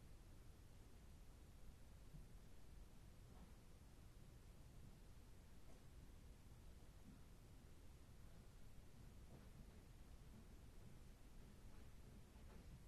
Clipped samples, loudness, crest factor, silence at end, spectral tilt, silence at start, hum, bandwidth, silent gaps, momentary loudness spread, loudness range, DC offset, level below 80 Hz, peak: under 0.1%; -66 LUFS; 14 dB; 0 s; -5.5 dB/octave; 0 s; none; 13 kHz; none; 2 LU; 1 LU; under 0.1%; -64 dBFS; -48 dBFS